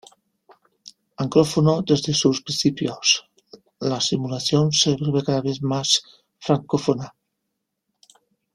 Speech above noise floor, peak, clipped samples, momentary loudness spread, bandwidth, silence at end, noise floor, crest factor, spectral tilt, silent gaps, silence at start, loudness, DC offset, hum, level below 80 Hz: 58 dB; -2 dBFS; under 0.1%; 7 LU; 13.5 kHz; 1.45 s; -79 dBFS; 20 dB; -4.5 dB/octave; none; 0.85 s; -21 LUFS; under 0.1%; none; -58 dBFS